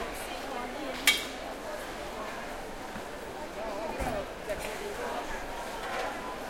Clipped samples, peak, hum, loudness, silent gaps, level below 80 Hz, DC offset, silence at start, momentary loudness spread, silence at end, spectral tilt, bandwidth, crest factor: under 0.1%; -6 dBFS; none; -34 LUFS; none; -50 dBFS; under 0.1%; 0 s; 13 LU; 0 s; -2 dB/octave; 16.5 kHz; 30 dB